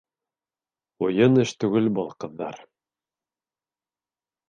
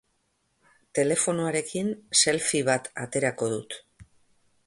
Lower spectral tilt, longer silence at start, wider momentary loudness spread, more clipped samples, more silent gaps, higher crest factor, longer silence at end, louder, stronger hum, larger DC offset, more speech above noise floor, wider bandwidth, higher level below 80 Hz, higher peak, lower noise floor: first, -7 dB/octave vs -3 dB/octave; about the same, 1 s vs 0.95 s; first, 15 LU vs 11 LU; neither; neither; about the same, 20 dB vs 22 dB; first, 1.9 s vs 0.65 s; about the same, -23 LUFS vs -25 LUFS; neither; neither; first, over 68 dB vs 46 dB; second, 9.4 kHz vs 11.5 kHz; about the same, -68 dBFS vs -66 dBFS; about the same, -6 dBFS vs -6 dBFS; first, under -90 dBFS vs -73 dBFS